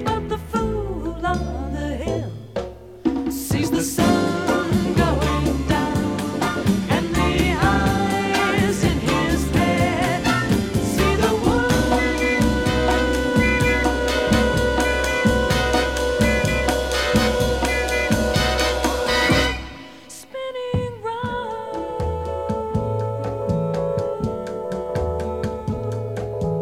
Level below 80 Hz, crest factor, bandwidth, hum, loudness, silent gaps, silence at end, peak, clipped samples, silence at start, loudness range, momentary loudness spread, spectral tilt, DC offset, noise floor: -30 dBFS; 16 dB; 17 kHz; none; -21 LUFS; none; 0 s; -4 dBFS; under 0.1%; 0 s; 6 LU; 9 LU; -5 dB/octave; 0.2%; -40 dBFS